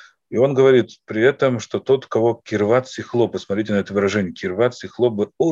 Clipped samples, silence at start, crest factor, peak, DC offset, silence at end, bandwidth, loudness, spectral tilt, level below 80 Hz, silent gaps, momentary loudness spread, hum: under 0.1%; 0.3 s; 16 dB; -2 dBFS; under 0.1%; 0 s; 7.6 kHz; -19 LUFS; -6.5 dB/octave; -62 dBFS; none; 9 LU; none